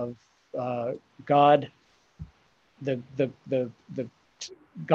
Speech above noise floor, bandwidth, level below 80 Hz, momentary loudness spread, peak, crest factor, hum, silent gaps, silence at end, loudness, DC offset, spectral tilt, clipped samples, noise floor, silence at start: 37 dB; 7.8 kHz; -62 dBFS; 22 LU; -8 dBFS; 22 dB; none; none; 0 s; -27 LUFS; under 0.1%; -6.5 dB/octave; under 0.1%; -64 dBFS; 0 s